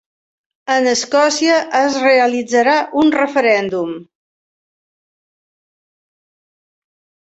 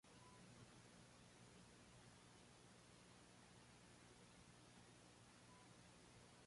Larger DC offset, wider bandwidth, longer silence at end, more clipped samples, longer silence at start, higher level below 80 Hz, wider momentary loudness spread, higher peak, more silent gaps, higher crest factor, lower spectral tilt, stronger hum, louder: neither; second, 8.2 kHz vs 11.5 kHz; first, 3.35 s vs 0 s; neither; first, 0.65 s vs 0.05 s; first, -62 dBFS vs -82 dBFS; first, 9 LU vs 2 LU; first, -2 dBFS vs -52 dBFS; neither; about the same, 16 dB vs 14 dB; about the same, -2.5 dB/octave vs -3.5 dB/octave; second, none vs 60 Hz at -75 dBFS; first, -14 LUFS vs -66 LUFS